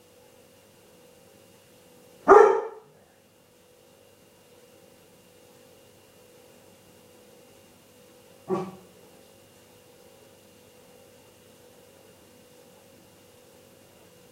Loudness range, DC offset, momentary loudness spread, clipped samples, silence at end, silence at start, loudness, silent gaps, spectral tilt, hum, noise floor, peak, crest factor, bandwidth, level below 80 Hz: 16 LU; under 0.1%; 34 LU; under 0.1%; 5.6 s; 2.25 s; -21 LUFS; none; -5.5 dB/octave; none; -59 dBFS; -2 dBFS; 28 dB; 16 kHz; -66 dBFS